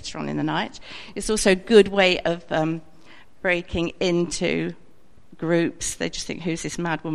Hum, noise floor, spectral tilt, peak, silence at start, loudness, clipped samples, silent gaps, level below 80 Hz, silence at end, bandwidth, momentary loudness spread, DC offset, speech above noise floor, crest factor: none; -56 dBFS; -4.5 dB/octave; -2 dBFS; 0 s; -23 LUFS; under 0.1%; none; -46 dBFS; 0 s; 14 kHz; 15 LU; 0.7%; 34 dB; 22 dB